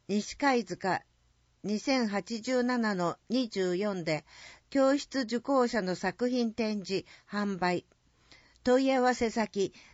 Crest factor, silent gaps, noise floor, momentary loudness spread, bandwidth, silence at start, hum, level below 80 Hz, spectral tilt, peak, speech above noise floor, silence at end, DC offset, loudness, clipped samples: 16 dB; none; -69 dBFS; 9 LU; 8 kHz; 0.1 s; none; -64 dBFS; -4 dB/octave; -14 dBFS; 39 dB; 0.15 s; under 0.1%; -30 LUFS; under 0.1%